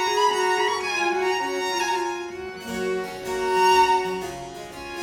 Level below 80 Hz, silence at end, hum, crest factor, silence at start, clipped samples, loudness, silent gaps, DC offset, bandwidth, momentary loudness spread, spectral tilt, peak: -54 dBFS; 0 s; none; 16 dB; 0 s; under 0.1%; -23 LUFS; none; under 0.1%; 17 kHz; 15 LU; -2.5 dB/octave; -8 dBFS